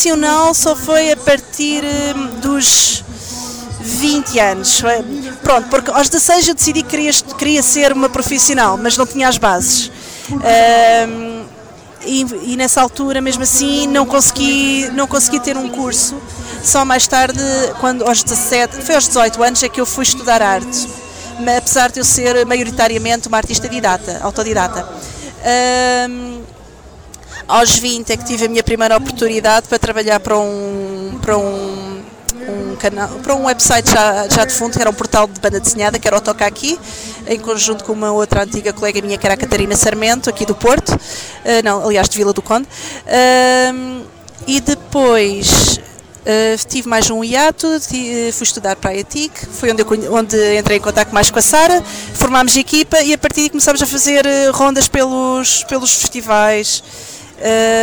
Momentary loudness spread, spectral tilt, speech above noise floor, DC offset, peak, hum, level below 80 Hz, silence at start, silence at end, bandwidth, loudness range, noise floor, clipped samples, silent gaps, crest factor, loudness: 12 LU; -2.5 dB/octave; 24 dB; under 0.1%; 0 dBFS; none; -34 dBFS; 0 s; 0 s; over 20 kHz; 4 LU; -37 dBFS; under 0.1%; none; 12 dB; -12 LUFS